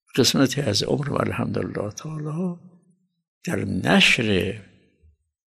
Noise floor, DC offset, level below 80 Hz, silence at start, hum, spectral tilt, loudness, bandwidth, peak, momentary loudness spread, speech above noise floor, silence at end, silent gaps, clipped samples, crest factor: -64 dBFS; under 0.1%; -54 dBFS; 0.15 s; none; -4.5 dB/octave; -22 LUFS; 13.5 kHz; -6 dBFS; 14 LU; 41 dB; 0.85 s; 3.28-3.41 s; under 0.1%; 18 dB